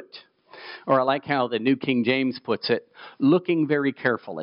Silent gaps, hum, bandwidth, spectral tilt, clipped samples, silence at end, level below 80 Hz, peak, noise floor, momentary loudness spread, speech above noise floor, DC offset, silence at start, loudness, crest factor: none; none; 5.6 kHz; -4 dB/octave; under 0.1%; 0 s; -76 dBFS; -8 dBFS; -49 dBFS; 6 LU; 26 dB; under 0.1%; 0 s; -23 LUFS; 16 dB